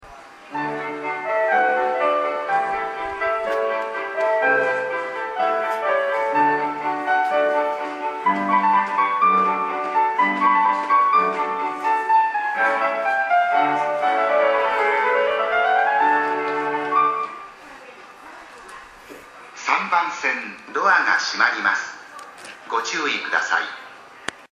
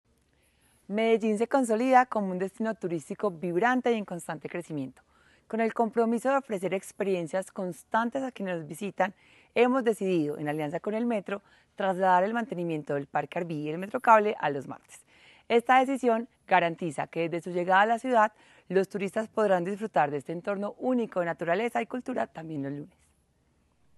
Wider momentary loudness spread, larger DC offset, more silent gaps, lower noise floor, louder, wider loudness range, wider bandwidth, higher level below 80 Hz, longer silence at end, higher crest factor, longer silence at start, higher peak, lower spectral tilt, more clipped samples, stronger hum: first, 17 LU vs 12 LU; neither; neither; second, -42 dBFS vs -69 dBFS; first, -20 LUFS vs -28 LUFS; about the same, 5 LU vs 5 LU; about the same, 12 kHz vs 12.5 kHz; first, -64 dBFS vs -74 dBFS; second, 0.05 s vs 1.1 s; about the same, 18 dB vs 22 dB; second, 0.05 s vs 0.9 s; first, -2 dBFS vs -6 dBFS; second, -3 dB/octave vs -6 dB/octave; neither; neither